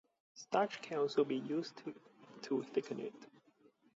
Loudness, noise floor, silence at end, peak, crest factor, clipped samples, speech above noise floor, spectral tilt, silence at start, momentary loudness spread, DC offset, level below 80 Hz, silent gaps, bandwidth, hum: -39 LUFS; -70 dBFS; 0.7 s; -20 dBFS; 20 dB; under 0.1%; 32 dB; -4 dB/octave; 0.35 s; 18 LU; under 0.1%; under -90 dBFS; none; 7.6 kHz; none